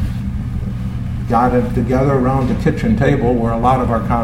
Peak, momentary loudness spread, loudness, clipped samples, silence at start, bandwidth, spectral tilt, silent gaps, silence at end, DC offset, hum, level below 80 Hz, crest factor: 0 dBFS; 9 LU; -16 LUFS; under 0.1%; 0 s; 13 kHz; -8.5 dB/octave; none; 0 s; under 0.1%; none; -26 dBFS; 14 dB